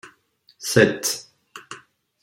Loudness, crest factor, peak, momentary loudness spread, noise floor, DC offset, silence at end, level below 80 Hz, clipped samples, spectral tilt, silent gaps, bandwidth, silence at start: -21 LUFS; 22 dB; -2 dBFS; 24 LU; -60 dBFS; under 0.1%; 0.45 s; -60 dBFS; under 0.1%; -3.5 dB/octave; none; 16.5 kHz; 0.05 s